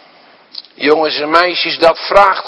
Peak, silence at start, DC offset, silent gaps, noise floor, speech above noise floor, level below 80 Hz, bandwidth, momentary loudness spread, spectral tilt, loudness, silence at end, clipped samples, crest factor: 0 dBFS; 0.55 s; under 0.1%; none; -44 dBFS; 32 dB; -44 dBFS; 11 kHz; 21 LU; -4 dB/octave; -11 LUFS; 0 s; 0.7%; 14 dB